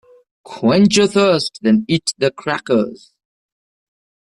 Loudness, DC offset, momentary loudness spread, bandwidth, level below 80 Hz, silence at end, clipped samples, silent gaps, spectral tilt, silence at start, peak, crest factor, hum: -16 LUFS; under 0.1%; 8 LU; 11.5 kHz; -56 dBFS; 1.45 s; under 0.1%; none; -5 dB/octave; 0.5 s; -2 dBFS; 14 dB; none